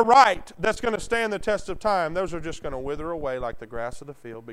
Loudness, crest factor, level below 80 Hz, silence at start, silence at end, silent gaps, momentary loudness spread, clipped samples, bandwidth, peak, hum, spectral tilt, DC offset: -25 LUFS; 22 dB; -44 dBFS; 0 s; 0 s; none; 13 LU; under 0.1%; 13.5 kHz; -2 dBFS; none; -4 dB/octave; under 0.1%